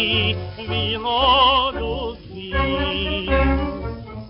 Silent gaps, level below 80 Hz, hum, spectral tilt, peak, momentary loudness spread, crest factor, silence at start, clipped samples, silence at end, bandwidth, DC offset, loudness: none; -30 dBFS; none; -2.5 dB/octave; -4 dBFS; 14 LU; 16 dB; 0 s; under 0.1%; 0 s; 5.6 kHz; under 0.1%; -20 LUFS